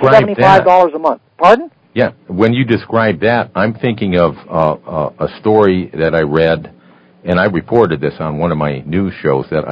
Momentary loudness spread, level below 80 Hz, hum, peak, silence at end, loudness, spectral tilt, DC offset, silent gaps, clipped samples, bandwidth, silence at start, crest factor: 9 LU; -40 dBFS; none; 0 dBFS; 0 s; -13 LUFS; -8 dB/octave; under 0.1%; none; 0.8%; 8 kHz; 0 s; 12 dB